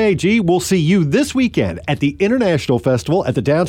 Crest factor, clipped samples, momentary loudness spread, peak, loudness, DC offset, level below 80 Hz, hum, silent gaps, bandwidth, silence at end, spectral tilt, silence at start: 10 dB; under 0.1%; 4 LU; -4 dBFS; -16 LUFS; under 0.1%; -42 dBFS; none; none; 16.5 kHz; 0 s; -6 dB/octave; 0 s